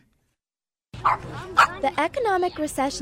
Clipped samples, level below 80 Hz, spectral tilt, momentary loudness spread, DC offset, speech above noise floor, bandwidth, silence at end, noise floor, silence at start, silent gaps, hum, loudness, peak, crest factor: under 0.1%; -50 dBFS; -3.5 dB/octave; 7 LU; under 0.1%; over 67 dB; 16 kHz; 0 s; under -90 dBFS; 0.95 s; none; none; -23 LUFS; -6 dBFS; 20 dB